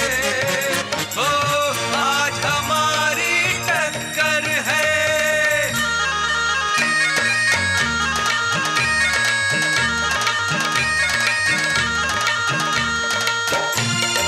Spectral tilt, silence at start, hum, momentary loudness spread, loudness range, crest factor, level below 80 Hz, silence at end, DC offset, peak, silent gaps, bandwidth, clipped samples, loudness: -2 dB/octave; 0 s; none; 3 LU; 1 LU; 16 dB; -46 dBFS; 0 s; under 0.1%; -2 dBFS; none; 16 kHz; under 0.1%; -18 LUFS